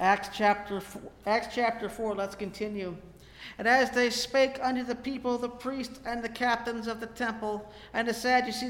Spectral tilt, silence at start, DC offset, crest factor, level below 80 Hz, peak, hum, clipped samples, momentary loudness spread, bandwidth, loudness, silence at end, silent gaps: -3.5 dB/octave; 0 s; under 0.1%; 20 dB; -58 dBFS; -10 dBFS; none; under 0.1%; 12 LU; 17 kHz; -30 LUFS; 0 s; none